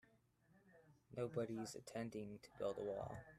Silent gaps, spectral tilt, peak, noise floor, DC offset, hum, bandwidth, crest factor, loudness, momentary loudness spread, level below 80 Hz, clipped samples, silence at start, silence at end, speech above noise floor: none; -6 dB/octave; -32 dBFS; -76 dBFS; under 0.1%; none; 14 kHz; 18 dB; -48 LUFS; 7 LU; -76 dBFS; under 0.1%; 0.5 s; 0 s; 28 dB